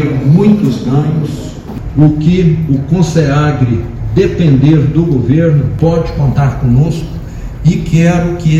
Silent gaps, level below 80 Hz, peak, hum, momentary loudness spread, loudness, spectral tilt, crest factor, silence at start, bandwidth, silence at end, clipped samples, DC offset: none; -26 dBFS; 0 dBFS; none; 10 LU; -11 LUFS; -8.5 dB/octave; 10 dB; 0 s; 8 kHz; 0 s; 0.9%; under 0.1%